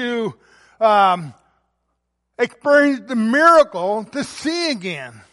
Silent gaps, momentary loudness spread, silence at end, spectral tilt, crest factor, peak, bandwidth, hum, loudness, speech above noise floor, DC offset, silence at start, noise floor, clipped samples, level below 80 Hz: none; 15 LU; 0.2 s; -4.5 dB/octave; 16 dB; -2 dBFS; 11.5 kHz; none; -17 LUFS; 56 dB; under 0.1%; 0 s; -73 dBFS; under 0.1%; -64 dBFS